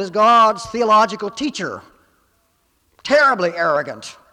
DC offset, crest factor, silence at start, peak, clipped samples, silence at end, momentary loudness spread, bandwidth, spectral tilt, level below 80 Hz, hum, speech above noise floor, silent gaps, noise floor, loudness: under 0.1%; 14 dB; 0 s; -4 dBFS; under 0.1%; 0.2 s; 17 LU; 12 kHz; -3.5 dB/octave; -58 dBFS; none; 46 dB; none; -63 dBFS; -16 LUFS